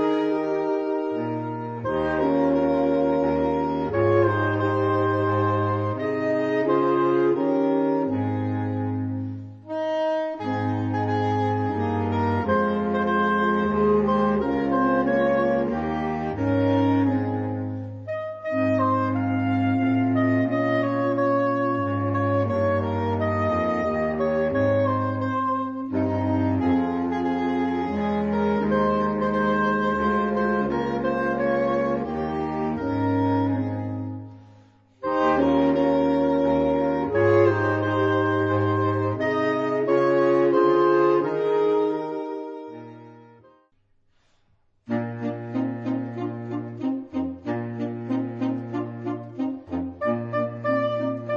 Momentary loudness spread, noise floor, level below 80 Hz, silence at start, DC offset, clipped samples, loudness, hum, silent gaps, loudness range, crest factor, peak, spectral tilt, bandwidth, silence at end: 9 LU; -64 dBFS; -52 dBFS; 0 s; under 0.1%; under 0.1%; -23 LUFS; none; none; 8 LU; 16 dB; -8 dBFS; -9 dB/octave; 7 kHz; 0 s